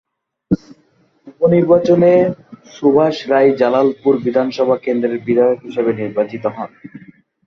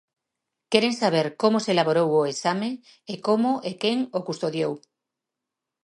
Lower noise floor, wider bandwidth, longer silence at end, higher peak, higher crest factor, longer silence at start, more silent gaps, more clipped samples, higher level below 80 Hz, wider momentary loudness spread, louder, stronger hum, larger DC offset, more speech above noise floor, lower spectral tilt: second, -56 dBFS vs -86 dBFS; second, 6.4 kHz vs 11.5 kHz; second, 0.5 s vs 1.05 s; about the same, -2 dBFS vs -4 dBFS; second, 14 dB vs 20 dB; second, 0.5 s vs 0.7 s; neither; neither; first, -54 dBFS vs -74 dBFS; about the same, 10 LU vs 9 LU; first, -15 LUFS vs -24 LUFS; neither; neither; second, 42 dB vs 62 dB; first, -8 dB/octave vs -5 dB/octave